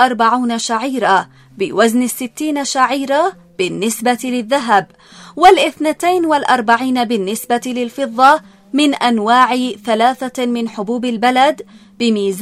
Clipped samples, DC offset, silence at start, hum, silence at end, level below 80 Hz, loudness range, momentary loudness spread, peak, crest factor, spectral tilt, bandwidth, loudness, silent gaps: 0.1%; under 0.1%; 0 s; none; 0 s; -56 dBFS; 2 LU; 9 LU; 0 dBFS; 14 dB; -3.5 dB/octave; 16 kHz; -15 LUFS; none